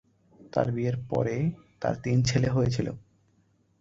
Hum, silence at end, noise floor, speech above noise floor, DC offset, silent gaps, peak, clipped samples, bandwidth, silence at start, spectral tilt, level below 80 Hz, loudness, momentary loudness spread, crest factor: none; 0.8 s; -67 dBFS; 40 dB; under 0.1%; none; -8 dBFS; under 0.1%; 7.8 kHz; 0.55 s; -6.5 dB/octave; -52 dBFS; -28 LUFS; 8 LU; 20 dB